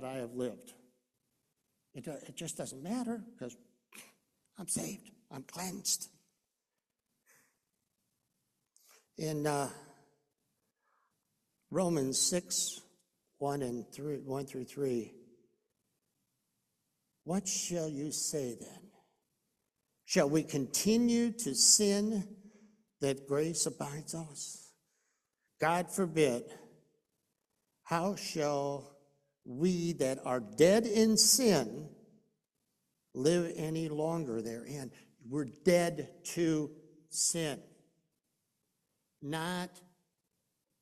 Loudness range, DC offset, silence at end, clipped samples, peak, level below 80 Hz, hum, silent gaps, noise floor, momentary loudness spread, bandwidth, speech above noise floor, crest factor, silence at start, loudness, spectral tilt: 13 LU; under 0.1%; 1 s; under 0.1%; -10 dBFS; -72 dBFS; none; none; -89 dBFS; 20 LU; 14.5 kHz; 55 dB; 26 dB; 0 s; -33 LUFS; -3.5 dB/octave